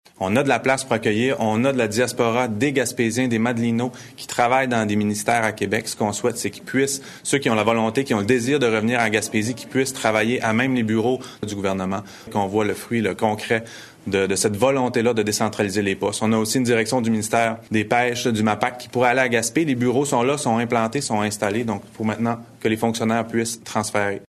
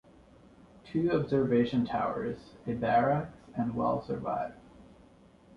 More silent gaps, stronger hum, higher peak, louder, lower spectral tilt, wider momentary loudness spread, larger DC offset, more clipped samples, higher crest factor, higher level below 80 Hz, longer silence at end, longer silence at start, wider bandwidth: neither; neither; first, -4 dBFS vs -14 dBFS; first, -21 LUFS vs -31 LUFS; second, -4.5 dB/octave vs -9 dB/octave; second, 6 LU vs 11 LU; neither; neither; about the same, 18 dB vs 18 dB; about the same, -58 dBFS vs -58 dBFS; second, 0.05 s vs 0.75 s; second, 0.2 s vs 0.85 s; first, 13 kHz vs 6.8 kHz